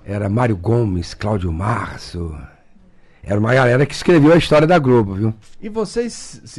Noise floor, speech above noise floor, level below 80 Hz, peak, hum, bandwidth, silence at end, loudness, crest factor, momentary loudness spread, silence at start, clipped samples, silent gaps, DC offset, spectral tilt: -47 dBFS; 30 dB; -38 dBFS; -6 dBFS; none; 12 kHz; 0 s; -16 LUFS; 12 dB; 16 LU; 0.05 s; under 0.1%; none; under 0.1%; -7 dB/octave